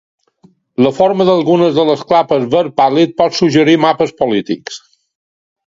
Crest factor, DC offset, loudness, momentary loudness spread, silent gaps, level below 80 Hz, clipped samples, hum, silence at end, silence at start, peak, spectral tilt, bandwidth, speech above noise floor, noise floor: 12 dB; under 0.1%; -12 LUFS; 10 LU; none; -54 dBFS; under 0.1%; none; 0.9 s; 0.8 s; 0 dBFS; -6 dB/octave; 7.8 kHz; 39 dB; -50 dBFS